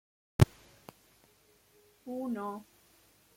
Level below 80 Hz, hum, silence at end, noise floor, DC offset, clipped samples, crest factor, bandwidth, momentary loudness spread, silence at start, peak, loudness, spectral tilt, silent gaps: -50 dBFS; none; 0.75 s; -66 dBFS; under 0.1%; under 0.1%; 30 dB; 16.5 kHz; 27 LU; 0.4 s; -6 dBFS; -33 LUFS; -7 dB/octave; none